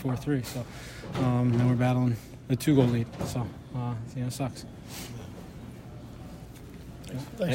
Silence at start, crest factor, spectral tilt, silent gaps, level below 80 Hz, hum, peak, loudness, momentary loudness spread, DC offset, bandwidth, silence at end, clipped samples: 0 s; 22 dB; -7 dB/octave; none; -50 dBFS; none; -8 dBFS; -29 LUFS; 20 LU; under 0.1%; 16 kHz; 0 s; under 0.1%